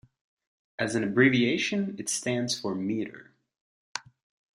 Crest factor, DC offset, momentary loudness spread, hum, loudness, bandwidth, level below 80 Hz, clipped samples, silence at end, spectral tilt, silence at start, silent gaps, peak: 22 dB; under 0.1%; 18 LU; none; -27 LUFS; 14 kHz; -68 dBFS; under 0.1%; 0.55 s; -4 dB/octave; 0.8 s; 3.61-3.95 s; -8 dBFS